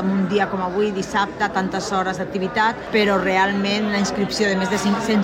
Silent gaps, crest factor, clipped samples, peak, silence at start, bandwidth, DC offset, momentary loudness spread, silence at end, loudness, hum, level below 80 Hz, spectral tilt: none; 14 dB; under 0.1%; -6 dBFS; 0 s; 15.5 kHz; under 0.1%; 5 LU; 0 s; -20 LUFS; none; -48 dBFS; -5 dB/octave